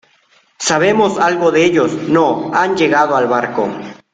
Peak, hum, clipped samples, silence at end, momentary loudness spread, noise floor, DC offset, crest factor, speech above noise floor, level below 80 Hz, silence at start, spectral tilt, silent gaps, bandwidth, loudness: -2 dBFS; none; under 0.1%; 0.2 s; 7 LU; -54 dBFS; under 0.1%; 14 dB; 41 dB; -54 dBFS; 0.6 s; -4.5 dB/octave; none; 9.4 kHz; -14 LUFS